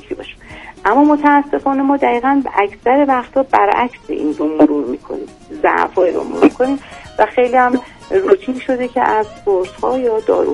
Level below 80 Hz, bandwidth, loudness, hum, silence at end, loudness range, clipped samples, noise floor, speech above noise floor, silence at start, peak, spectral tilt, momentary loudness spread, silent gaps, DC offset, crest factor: -46 dBFS; 10.5 kHz; -15 LUFS; none; 0 s; 2 LU; 0.2%; -35 dBFS; 21 dB; 0.1 s; 0 dBFS; -6 dB/octave; 11 LU; none; under 0.1%; 14 dB